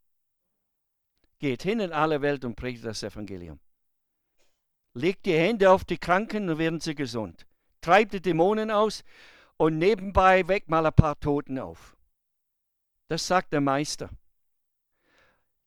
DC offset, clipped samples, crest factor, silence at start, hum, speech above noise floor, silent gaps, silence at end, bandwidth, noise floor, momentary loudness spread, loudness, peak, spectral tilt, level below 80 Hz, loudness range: under 0.1%; under 0.1%; 26 dB; 1.4 s; none; 54 dB; none; 1.5 s; 15 kHz; -79 dBFS; 16 LU; -25 LUFS; 0 dBFS; -6 dB/octave; -46 dBFS; 7 LU